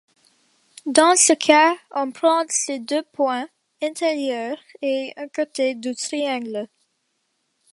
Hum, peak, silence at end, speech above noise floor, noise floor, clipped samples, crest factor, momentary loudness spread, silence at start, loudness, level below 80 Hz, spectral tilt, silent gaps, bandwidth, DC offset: none; 0 dBFS; 1.1 s; 51 dB; -72 dBFS; under 0.1%; 22 dB; 15 LU; 0.85 s; -20 LUFS; -74 dBFS; -0.5 dB/octave; none; 11.5 kHz; under 0.1%